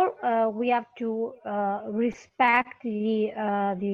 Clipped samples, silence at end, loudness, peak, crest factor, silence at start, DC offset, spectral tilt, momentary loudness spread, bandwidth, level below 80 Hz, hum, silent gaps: under 0.1%; 0 s; -27 LUFS; -8 dBFS; 18 dB; 0 s; under 0.1%; -7 dB/octave; 9 LU; 7.2 kHz; -68 dBFS; none; none